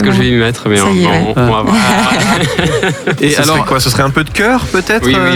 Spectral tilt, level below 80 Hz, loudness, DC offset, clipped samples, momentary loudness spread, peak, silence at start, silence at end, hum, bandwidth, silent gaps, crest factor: -4.5 dB/octave; -30 dBFS; -10 LUFS; under 0.1%; under 0.1%; 3 LU; 0 dBFS; 0 s; 0 s; none; 20 kHz; none; 10 dB